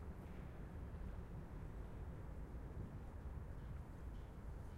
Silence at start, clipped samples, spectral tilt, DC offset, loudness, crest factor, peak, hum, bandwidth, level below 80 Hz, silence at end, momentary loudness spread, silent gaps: 0 s; under 0.1%; -8 dB/octave; under 0.1%; -53 LUFS; 14 dB; -38 dBFS; none; 15.5 kHz; -54 dBFS; 0 s; 2 LU; none